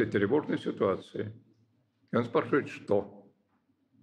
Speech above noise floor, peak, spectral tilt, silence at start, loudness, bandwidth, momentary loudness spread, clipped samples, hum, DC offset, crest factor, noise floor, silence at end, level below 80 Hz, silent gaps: 43 dB; -14 dBFS; -7.5 dB/octave; 0 s; -31 LUFS; 9.6 kHz; 11 LU; under 0.1%; none; under 0.1%; 18 dB; -73 dBFS; 0.8 s; -74 dBFS; none